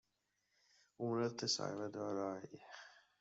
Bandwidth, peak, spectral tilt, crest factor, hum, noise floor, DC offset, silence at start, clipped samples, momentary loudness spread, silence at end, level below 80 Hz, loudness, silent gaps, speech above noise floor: 8 kHz; -26 dBFS; -4 dB/octave; 18 dB; none; -85 dBFS; under 0.1%; 1 s; under 0.1%; 18 LU; 0.2 s; -88 dBFS; -41 LUFS; none; 43 dB